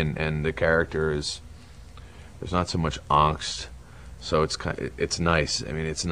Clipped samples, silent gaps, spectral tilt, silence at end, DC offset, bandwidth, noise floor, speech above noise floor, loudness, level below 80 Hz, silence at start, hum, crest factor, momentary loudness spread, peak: under 0.1%; none; -4.5 dB/octave; 0 s; 0.2%; 10.5 kHz; -45 dBFS; 20 dB; -26 LUFS; -40 dBFS; 0 s; none; 22 dB; 21 LU; -6 dBFS